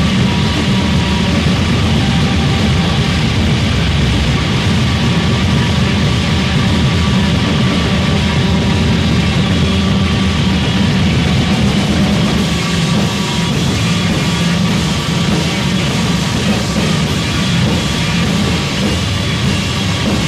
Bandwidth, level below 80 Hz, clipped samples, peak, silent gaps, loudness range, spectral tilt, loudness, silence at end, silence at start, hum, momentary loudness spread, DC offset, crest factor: 14.5 kHz; -24 dBFS; under 0.1%; -2 dBFS; none; 1 LU; -5 dB/octave; -13 LUFS; 0 s; 0 s; none; 2 LU; under 0.1%; 12 dB